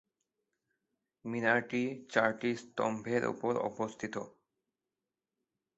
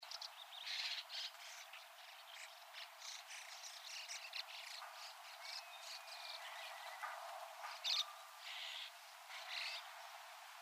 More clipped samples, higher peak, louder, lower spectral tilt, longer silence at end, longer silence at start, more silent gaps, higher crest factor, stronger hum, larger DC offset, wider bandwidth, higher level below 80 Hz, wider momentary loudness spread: neither; first, -12 dBFS vs -28 dBFS; first, -34 LUFS vs -48 LUFS; first, -4 dB/octave vs 7 dB/octave; first, 1.5 s vs 0 s; first, 1.25 s vs 0 s; neither; about the same, 26 dB vs 24 dB; neither; neither; second, 8 kHz vs 15.5 kHz; first, -76 dBFS vs under -90 dBFS; about the same, 11 LU vs 11 LU